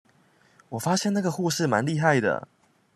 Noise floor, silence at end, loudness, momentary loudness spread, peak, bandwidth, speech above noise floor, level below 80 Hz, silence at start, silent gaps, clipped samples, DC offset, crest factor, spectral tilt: -61 dBFS; 0.5 s; -25 LUFS; 9 LU; -6 dBFS; 14 kHz; 37 dB; -70 dBFS; 0.7 s; none; under 0.1%; under 0.1%; 20 dB; -5 dB/octave